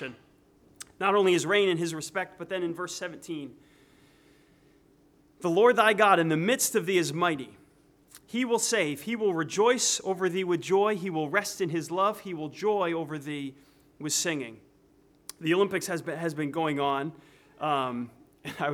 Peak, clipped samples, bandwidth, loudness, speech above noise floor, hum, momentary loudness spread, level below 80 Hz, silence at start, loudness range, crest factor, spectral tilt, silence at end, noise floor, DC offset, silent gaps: -8 dBFS; under 0.1%; 17.5 kHz; -27 LUFS; 34 dB; none; 16 LU; -72 dBFS; 0 s; 7 LU; 22 dB; -3.5 dB/octave; 0 s; -62 dBFS; under 0.1%; none